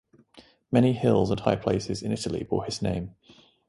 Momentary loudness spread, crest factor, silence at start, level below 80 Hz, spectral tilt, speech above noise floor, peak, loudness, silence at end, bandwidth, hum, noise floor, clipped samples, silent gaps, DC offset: 8 LU; 20 dB; 0.35 s; -50 dBFS; -6.5 dB/octave; 30 dB; -6 dBFS; -26 LUFS; 0.6 s; 11.5 kHz; none; -56 dBFS; under 0.1%; none; under 0.1%